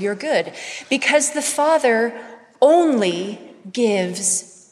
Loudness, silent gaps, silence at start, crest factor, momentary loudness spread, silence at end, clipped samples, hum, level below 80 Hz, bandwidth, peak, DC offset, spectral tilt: -18 LUFS; none; 0 s; 16 dB; 15 LU; 0.25 s; under 0.1%; none; -74 dBFS; 14 kHz; -2 dBFS; under 0.1%; -3 dB/octave